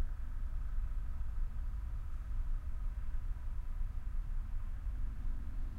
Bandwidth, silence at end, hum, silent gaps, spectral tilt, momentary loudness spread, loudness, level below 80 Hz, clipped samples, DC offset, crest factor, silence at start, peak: 2.9 kHz; 0 s; none; none; -7.5 dB/octave; 2 LU; -45 LUFS; -38 dBFS; under 0.1%; under 0.1%; 10 dB; 0 s; -26 dBFS